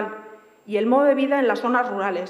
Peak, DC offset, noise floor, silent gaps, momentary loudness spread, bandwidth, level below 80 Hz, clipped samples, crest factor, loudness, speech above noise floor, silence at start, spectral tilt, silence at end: -6 dBFS; under 0.1%; -44 dBFS; none; 12 LU; 11.5 kHz; -86 dBFS; under 0.1%; 16 dB; -20 LUFS; 24 dB; 0 s; -6 dB/octave; 0 s